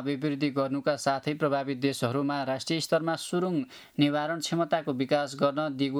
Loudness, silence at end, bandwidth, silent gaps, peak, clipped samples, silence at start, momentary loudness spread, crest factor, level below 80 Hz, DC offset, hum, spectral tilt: -29 LUFS; 0 s; 14.5 kHz; none; -12 dBFS; under 0.1%; 0 s; 3 LU; 16 dB; -74 dBFS; under 0.1%; none; -5.5 dB/octave